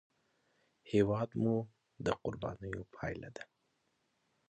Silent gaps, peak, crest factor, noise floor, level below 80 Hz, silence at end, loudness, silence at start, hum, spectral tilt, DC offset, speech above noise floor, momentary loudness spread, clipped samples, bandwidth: none; -16 dBFS; 22 dB; -79 dBFS; -62 dBFS; 1.05 s; -37 LUFS; 0.85 s; none; -7.5 dB/octave; under 0.1%; 44 dB; 18 LU; under 0.1%; 9 kHz